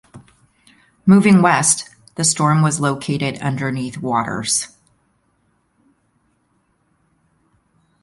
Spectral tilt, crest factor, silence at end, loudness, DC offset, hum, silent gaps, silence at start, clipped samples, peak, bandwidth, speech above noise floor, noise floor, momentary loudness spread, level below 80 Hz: -4.5 dB/octave; 20 dB; 3.35 s; -16 LUFS; under 0.1%; none; none; 0.15 s; under 0.1%; 0 dBFS; 11.5 kHz; 48 dB; -64 dBFS; 11 LU; -56 dBFS